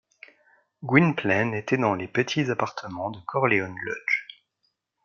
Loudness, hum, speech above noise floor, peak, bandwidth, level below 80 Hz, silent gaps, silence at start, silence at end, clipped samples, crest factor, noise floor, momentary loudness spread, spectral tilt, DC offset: -25 LUFS; none; 50 dB; -2 dBFS; 7.2 kHz; -68 dBFS; none; 0.8 s; 0.8 s; under 0.1%; 24 dB; -75 dBFS; 12 LU; -6.5 dB/octave; under 0.1%